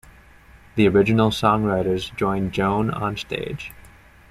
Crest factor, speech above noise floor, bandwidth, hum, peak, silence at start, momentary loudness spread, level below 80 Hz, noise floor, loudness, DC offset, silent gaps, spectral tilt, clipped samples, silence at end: 18 dB; 28 dB; 15 kHz; none; -4 dBFS; 0.75 s; 13 LU; -46 dBFS; -48 dBFS; -21 LUFS; under 0.1%; none; -6.5 dB/octave; under 0.1%; 0.55 s